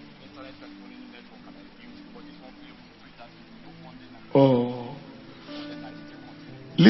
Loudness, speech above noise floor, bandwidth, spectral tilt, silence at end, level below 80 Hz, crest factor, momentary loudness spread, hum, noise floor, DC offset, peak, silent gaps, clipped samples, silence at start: -26 LUFS; 25 dB; 6 kHz; -9 dB/octave; 0 s; -62 dBFS; 26 dB; 25 LU; none; -49 dBFS; under 0.1%; -2 dBFS; none; under 0.1%; 0.4 s